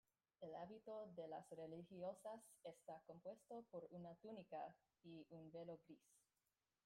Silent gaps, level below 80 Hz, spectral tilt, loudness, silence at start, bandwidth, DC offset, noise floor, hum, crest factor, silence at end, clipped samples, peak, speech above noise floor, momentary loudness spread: none; under -90 dBFS; -6.5 dB/octave; -58 LUFS; 0.4 s; 16 kHz; under 0.1%; under -90 dBFS; none; 16 dB; 0.65 s; under 0.1%; -42 dBFS; over 33 dB; 8 LU